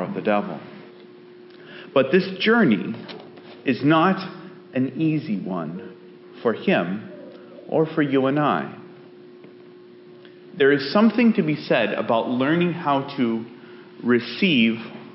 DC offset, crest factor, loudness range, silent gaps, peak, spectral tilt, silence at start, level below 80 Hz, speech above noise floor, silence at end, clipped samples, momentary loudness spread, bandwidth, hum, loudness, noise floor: under 0.1%; 18 dB; 5 LU; none; -6 dBFS; -4.5 dB/octave; 0 s; -72 dBFS; 25 dB; 0 s; under 0.1%; 22 LU; 5.8 kHz; none; -21 LUFS; -45 dBFS